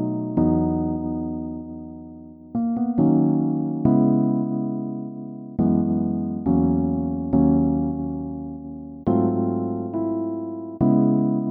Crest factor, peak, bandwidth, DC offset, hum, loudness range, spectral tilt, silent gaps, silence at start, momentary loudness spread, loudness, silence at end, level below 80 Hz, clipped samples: 18 dB; -4 dBFS; 2.1 kHz; under 0.1%; none; 2 LU; -15 dB/octave; none; 0 s; 15 LU; -22 LUFS; 0 s; -44 dBFS; under 0.1%